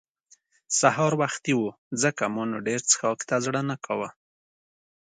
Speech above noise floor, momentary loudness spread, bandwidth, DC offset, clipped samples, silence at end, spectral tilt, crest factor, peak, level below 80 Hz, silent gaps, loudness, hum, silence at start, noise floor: 36 dB; 9 LU; 9.6 kHz; under 0.1%; under 0.1%; 0.95 s; -3.5 dB/octave; 22 dB; -4 dBFS; -72 dBFS; 1.78-1.91 s; -25 LUFS; none; 0.7 s; -62 dBFS